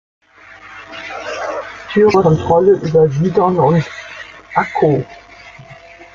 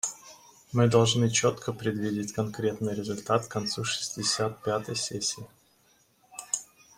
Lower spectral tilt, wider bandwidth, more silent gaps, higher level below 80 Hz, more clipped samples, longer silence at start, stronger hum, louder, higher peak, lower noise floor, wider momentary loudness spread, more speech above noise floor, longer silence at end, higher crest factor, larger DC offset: first, -7.5 dB/octave vs -4 dB/octave; second, 7.4 kHz vs 16 kHz; neither; first, -48 dBFS vs -62 dBFS; neither; first, 0.5 s vs 0.05 s; neither; first, -14 LUFS vs -28 LUFS; first, 0 dBFS vs -8 dBFS; second, -40 dBFS vs -65 dBFS; first, 20 LU vs 10 LU; second, 27 dB vs 37 dB; second, 0.1 s vs 0.35 s; second, 14 dB vs 22 dB; neither